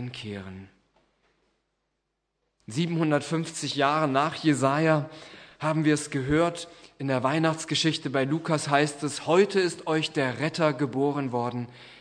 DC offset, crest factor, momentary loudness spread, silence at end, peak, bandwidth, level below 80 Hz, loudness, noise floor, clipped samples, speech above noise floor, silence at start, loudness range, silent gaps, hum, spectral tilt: under 0.1%; 22 dB; 14 LU; 0.05 s; -6 dBFS; 10.5 kHz; -60 dBFS; -26 LUFS; -79 dBFS; under 0.1%; 53 dB; 0 s; 5 LU; none; none; -5 dB/octave